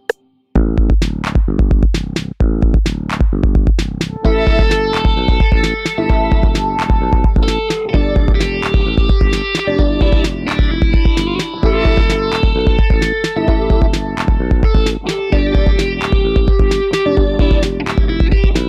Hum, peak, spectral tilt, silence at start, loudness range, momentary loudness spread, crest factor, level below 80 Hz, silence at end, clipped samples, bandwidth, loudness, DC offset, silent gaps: none; -4 dBFS; -6.5 dB/octave; 0.55 s; 1 LU; 4 LU; 10 dB; -14 dBFS; 0 s; under 0.1%; 8.4 kHz; -15 LUFS; under 0.1%; none